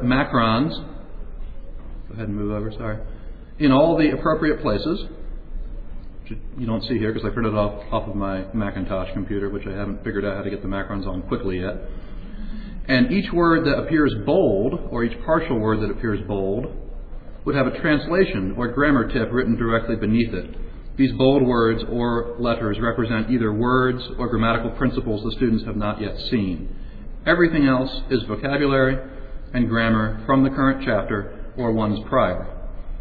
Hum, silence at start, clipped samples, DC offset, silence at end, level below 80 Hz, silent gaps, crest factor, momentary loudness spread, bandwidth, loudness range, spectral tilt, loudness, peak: none; 0 s; under 0.1%; under 0.1%; 0 s; -32 dBFS; none; 18 dB; 20 LU; 4.9 kHz; 6 LU; -10 dB/octave; -22 LUFS; -4 dBFS